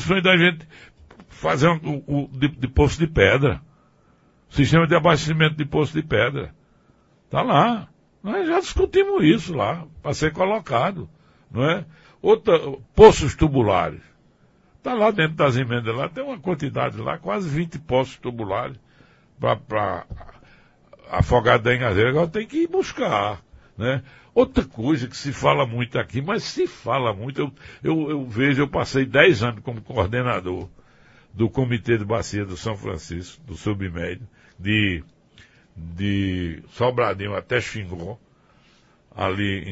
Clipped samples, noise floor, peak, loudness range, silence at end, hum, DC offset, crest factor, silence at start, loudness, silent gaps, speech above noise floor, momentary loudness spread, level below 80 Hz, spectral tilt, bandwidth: under 0.1%; -58 dBFS; 0 dBFS; 8 LU; 0 s; none; under 0.1%; 22 dB; 0 s; -21 LUFS; none; 37 dB; 14 LU; -40 dBFS; -6 dB/octave; 8 kHz